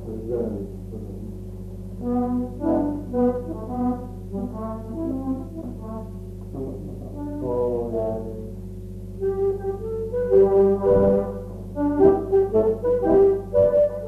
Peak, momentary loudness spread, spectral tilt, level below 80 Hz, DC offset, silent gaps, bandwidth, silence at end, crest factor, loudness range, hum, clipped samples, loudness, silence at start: -4 dBFS; 17 LU; -10 dB/octave; -40 dBFS; under 0.1%; none; 3.3 kHz; 0 s; 18 dB; 10 LU; 50 Hz at -35 dBFS; under 0.1%; -23 LUFS; 0 s